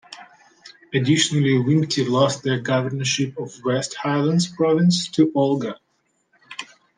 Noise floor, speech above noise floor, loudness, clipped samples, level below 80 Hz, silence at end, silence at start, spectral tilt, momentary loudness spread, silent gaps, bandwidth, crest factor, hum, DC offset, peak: -68 dBFS; 49 dB; -20 LUFS; under 0.1%; -64 dBFS; 0.35 s; 0.1 s; -5 dB/octave; 18 LU; none; 10 kHz; 18 dB; none; under 0.1%; -4 dBFS